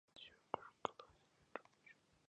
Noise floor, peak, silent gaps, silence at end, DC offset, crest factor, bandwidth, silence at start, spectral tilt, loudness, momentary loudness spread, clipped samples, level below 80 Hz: -73 dBFS; -20 dBFS; none; 0.35 s; under 0.1%; 34 dB; 9.6 kHz; 0.15 s; -4 dB/octave; -52 LUFS; 18 LU; under 0.1%; -84 dBFS